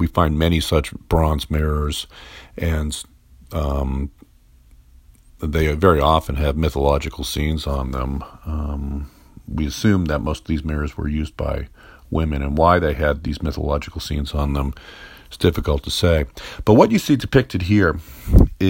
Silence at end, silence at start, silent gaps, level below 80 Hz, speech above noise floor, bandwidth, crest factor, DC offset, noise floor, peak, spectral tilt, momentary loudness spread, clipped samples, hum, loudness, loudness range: 0 s; 0 s; none; -28 dBFS; 31 dB; 16.5 kHz; 20 dB; under 0.1%; -50 dBFS; 0 dBFS; -6.5 dB/octave; 14 LU; under 0.1%; none; -20 LUFS; 6 LU